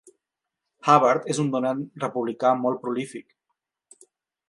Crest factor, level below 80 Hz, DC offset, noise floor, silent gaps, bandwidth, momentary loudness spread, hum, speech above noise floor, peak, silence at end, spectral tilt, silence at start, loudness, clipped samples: 22 dB; -76 dBFS; under 0.1%; -85 dBFS; none; 11.5 kHz; 12 LU; none; 62 dB; -4 dBFS; 1.3 s; -5.5 dB/octave; 0.85 s; -23 LUFS; under 0.1%